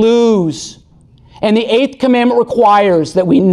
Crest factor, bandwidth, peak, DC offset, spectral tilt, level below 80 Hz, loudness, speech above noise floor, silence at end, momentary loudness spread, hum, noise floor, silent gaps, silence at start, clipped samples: 10 dB; 11 kHz; -2 dBFS; under 0.1%; -6 dB/octave; -48 dBFS; -11 LUFS; 34 dB; 0 s; 10 LU; none; -44 dBFS; none; 0 s; under 0.1%